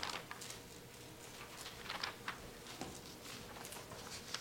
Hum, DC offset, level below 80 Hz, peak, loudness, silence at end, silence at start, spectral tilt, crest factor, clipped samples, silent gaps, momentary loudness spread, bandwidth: none; under 0.1%; -66 dBFS; -22 dBFS; -48 LUFS; 0 s; 0 s; -2 dB/octave; 28 dB; under 0.1%; none; 9 LU; 16.5 kHz